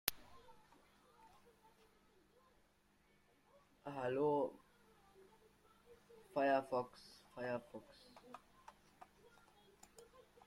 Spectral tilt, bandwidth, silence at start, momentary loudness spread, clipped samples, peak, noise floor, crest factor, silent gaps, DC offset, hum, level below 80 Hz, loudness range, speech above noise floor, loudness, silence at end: -4.5 dB/octave; 16 kHz; 0.05 s; 28 LU; under 0.1%; -10 dBFS; -75 dBFS; 38 dB; none; under 0.1%; none; -78 dBFS; 11 LU; 34 dB; -41 LUFS; 0.25 s